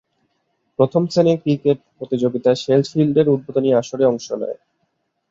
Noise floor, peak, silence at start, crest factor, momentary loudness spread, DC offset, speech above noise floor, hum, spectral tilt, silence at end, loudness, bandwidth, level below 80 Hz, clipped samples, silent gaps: -70 dBFS; -2 dBFS; 0.8 s; 16 dB; 10 LU; under 0.1%; 53 dB; none; -7 dB/octave; 0.75 s; -18 LUFS; 7.8 kHz; -62 dBFS; under 0.1%; none